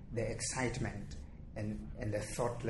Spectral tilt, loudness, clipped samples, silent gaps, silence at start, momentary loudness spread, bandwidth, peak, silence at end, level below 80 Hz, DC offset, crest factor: -5 dB/octave; -40 LUFS; under 0.1%; none; 0 s; 12 LU; 11.5 kHz; -22 dBFS; 0 s; -50 dBFS; under 0.1%; 18 dB